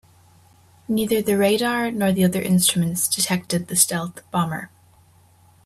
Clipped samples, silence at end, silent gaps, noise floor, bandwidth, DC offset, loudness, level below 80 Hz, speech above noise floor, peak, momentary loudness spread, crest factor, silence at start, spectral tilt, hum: under 0.1%; 1 s; none; -54 dBFS; 16 kHz; under 0.1%; -20 LUFS; -58 dBFS; 33 dB; -2 dBFS; 9 LU; 20 dB; 0.9 s; -4 dB/octave; none